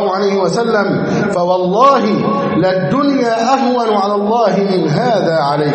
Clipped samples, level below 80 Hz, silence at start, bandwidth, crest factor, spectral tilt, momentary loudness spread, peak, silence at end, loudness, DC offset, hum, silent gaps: under 0.1%; -54 dBFS; 0 s; 8.8 kHz; 12 dB; -6.5 dB/octave; 4 LU; 0 dBFS; 0 s; -13 LUFS; under 0.1%; none; none